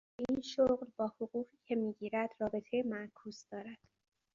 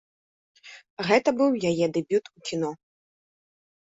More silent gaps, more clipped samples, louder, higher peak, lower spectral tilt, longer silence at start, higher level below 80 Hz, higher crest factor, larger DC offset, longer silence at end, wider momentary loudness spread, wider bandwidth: second, none vs 0.90-0.97 s; neither; second, -38 LUFS vs -25 LUFS; second, -20 dBFS vs -6 dBFS; about the same, -4.5 dB/octave vs -5.5 dB/octave; second, 0.2 s vs 0.65 s; about the same, -70 dBFS vs -68 dBFS; about the same, 18 dB vs 22 dB; neither; second, 0.6 s vs 1.1 s; first, 16 LU vs 11 LU; about the same, 7.4 kHz vs 8 kHz